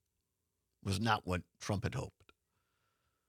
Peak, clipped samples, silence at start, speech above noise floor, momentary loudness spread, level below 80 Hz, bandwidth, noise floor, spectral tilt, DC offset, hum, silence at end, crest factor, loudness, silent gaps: -16 dBFS; under 0.1%; 0.85 s; 49 dB; 12 LU; -66 dBFS; 15 kHz; -86 dBFS; -5 dB/octave; under 0.1%; none; 1.2 s; 26 dB; -38 LUFS; none